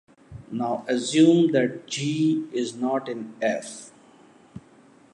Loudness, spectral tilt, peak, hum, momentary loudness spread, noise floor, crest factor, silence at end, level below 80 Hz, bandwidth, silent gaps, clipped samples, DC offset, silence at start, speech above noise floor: -24 LUFS; -5.5 dB/octave; -6 dBFS; none; 15 LU; -54 dBFS; 18 dB; 0.55 s; -64 dBFS; 11 kHz; none; under 0.1%; under 0.1%; 0.3 s; 31 dB